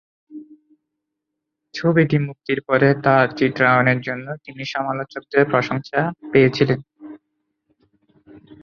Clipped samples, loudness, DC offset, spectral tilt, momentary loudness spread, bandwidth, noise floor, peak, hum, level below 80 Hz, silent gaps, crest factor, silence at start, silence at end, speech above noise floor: under 0.1%; -19 LUFS; under 0.1%; -7.5 dB/octave; 12 LU; 7 kHz; -80 dBFS; 0 dBFS; none; -58 dBFS; none; 20 dB; 0.3 s; 0.1 s; 62 dB